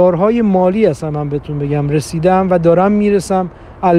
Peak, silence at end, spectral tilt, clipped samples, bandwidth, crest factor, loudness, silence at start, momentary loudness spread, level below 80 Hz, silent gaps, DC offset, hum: 0 dBFS; 0 s; -7.5 dB/octave; under 0.1%; 12.5 kHz; 12 dB; -14 LUFS; 0 s; 9 LU; -40 dBFS; none; under 0.1%; none